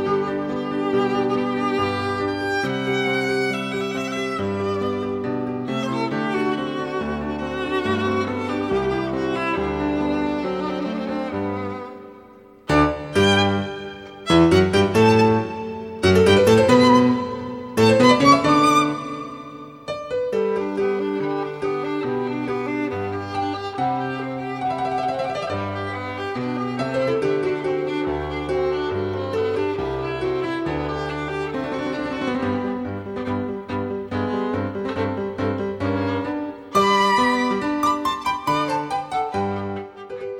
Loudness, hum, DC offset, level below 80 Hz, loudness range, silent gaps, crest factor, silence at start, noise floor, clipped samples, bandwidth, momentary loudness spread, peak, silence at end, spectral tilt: -22 LUFS; none; under 0.1%; -46 dBFS; 9 LU; none; 20 dB; 0 s; -46 dBFS; under 0.1%; 15 kHz; 12 LU; -2 dBFS; 0 s; -6 dB/octave